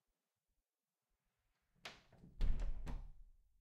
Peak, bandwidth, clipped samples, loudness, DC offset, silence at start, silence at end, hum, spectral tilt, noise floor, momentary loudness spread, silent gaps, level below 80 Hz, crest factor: -24 dBFS; 7.6 kHz; under 0.1%; -50 LUFS; under 0.1%; 1.85 s; 0.3 s; none; -5.5 dB/octave; under -90 dBFS; 18 LU; none; -46 dBFS; 20 dB